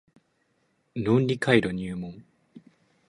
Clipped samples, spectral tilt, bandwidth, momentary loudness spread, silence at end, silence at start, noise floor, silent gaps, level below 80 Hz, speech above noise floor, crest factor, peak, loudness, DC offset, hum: under 0.1%; -7 dB/octave; 11.5 kHz; 16 LU; 0.5 s; 0.95 s; -71 dBFS; none; -58 dBFS; 46 dB; 24 dB; -6 dBFS; -25 LUFS; under 0.1%; none